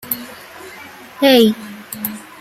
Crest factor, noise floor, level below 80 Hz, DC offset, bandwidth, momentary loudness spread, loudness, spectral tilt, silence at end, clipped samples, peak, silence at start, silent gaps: 18 dB; -37 dBFS; -60 dBFS; under 0.1%; 16 kHz; 24 LU; -15 LUFS; -4 dB/octave; 0.2 s; under 0.1%; 0 dBFS; 0.05 s; none